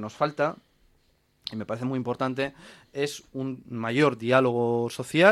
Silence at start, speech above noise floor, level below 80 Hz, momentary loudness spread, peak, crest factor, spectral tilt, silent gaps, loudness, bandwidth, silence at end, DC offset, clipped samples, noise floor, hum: 0 s; 41 dB; -66 dBFS; 13 LU; -4 dBFS; 22 dB; -5.5 dB/octave; none; -27 LUFS; 13.5 kHz; 0 s; under 0.1%; under 0.1%; -66 dBFS; none